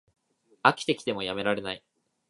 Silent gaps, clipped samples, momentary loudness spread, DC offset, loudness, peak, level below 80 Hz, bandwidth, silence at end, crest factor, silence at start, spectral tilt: none; under 0.1%; 11 LU; under 0.1%; -28 LUFS; -2 dBFS; -66 dBFS; 11.5 kHz; 0.5 s; 28 dB; 0.65 s; -4 dB/octave